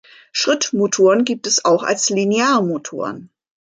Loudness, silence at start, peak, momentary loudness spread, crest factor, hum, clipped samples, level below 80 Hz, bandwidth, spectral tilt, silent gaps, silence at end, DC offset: -17 LUFS; 0.35 s; -2 dBFS; 12 LU; 14 dB; none; under 0.1%; -68 dBFS; 9.6 kHz; -3 dB/octave; none; 0.45 s; under 0.1%